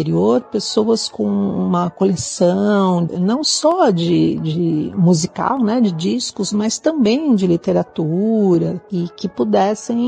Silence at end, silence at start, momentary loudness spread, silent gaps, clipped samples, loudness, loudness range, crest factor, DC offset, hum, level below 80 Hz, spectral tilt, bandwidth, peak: 0 s; 0 s; 5 LU; none; under 0.1%; -17 LUFS; 1 LU; 14 dB; under 0.1%; none; -56 dBFS; -5.5 dB/octave; 9.6 kHz; -2 dBFS